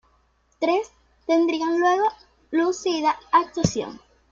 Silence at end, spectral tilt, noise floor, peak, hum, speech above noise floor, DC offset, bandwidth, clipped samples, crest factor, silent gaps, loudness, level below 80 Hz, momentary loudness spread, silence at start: 0.35 s; -5 dB/octave; -64 dBFS; -4 dBFS; none; 42 dB; under 0.1%; 7.6 kHz; under 0.1%; 20 dB; none; -23 LUFS; -56 dBFS; 9 LU; 0.6 s